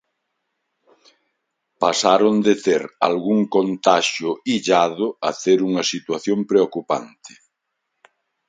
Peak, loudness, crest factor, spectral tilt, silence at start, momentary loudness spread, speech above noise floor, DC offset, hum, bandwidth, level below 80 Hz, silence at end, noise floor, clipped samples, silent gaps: 0 dBFS; -19 LUFS; 20 dB; -4 dB/octave; 1.8 s; 8 LU; 58 dB; under 0.1%; none; 9.4 kHz; -68 dBFS; 1.2 s; -77 dBFS; under 0.1%; none